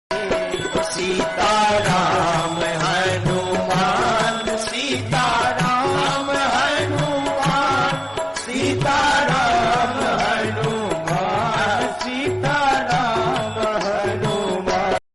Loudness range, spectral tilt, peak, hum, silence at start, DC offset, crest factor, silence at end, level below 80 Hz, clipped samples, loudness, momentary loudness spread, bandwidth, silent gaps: 2 LU; -4 dB/octave; -8 dBFS; none; 0.1 s; under 0.1%; 12 dB; 0.15 s; -44 dBFS; under 0.1%; -19 LUFS; 5 LU; 12 kHz; none